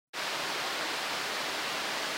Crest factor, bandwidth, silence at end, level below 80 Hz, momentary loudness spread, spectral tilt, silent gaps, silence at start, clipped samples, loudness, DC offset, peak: 14 dB; 16 kHz; 0 s; -74 dBFS; 1 LU; -0.5 dB/octave; none; 0.15 s; under 0.1%; -32 LUFS; under 0.1%; -22 dBFS